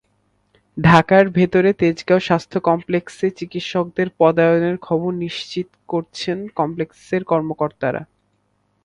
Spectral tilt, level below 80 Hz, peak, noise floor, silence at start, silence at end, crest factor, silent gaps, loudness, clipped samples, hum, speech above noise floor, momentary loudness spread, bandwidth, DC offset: -7 dB/octave; -50 dBFS; 0 dBFS; -66 dBFS; 0.75 s; 0.8 s; 18 dB; none; -18 LUFS; under 0.1%; none; 48 dB; 12 LU; 11 kHz; under 0.1%